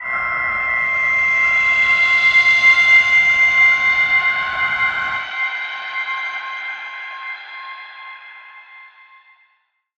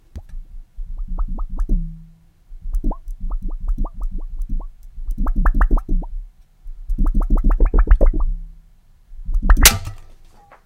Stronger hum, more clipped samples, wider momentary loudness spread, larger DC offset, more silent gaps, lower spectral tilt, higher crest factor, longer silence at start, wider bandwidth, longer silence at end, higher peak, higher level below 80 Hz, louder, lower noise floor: neither; neither; second, 19 LU vs 22 LU; neither; neither; second, -0.5 dB/octave vs -3 dB/octave; about the same, 16 dB vs 18 dB; second, 0 s vs 0.15 s; second, 8.2 kHz vs 16.5 kHz; first, 1.1 s vs 0.55 s; about the same, -2 dBFS vs 0 dBFS; second, -52 dBFS vs -18 dBFS; first, -13 LUFS vs -22 LUFS; first, -64 dBFS vs -49 dBFS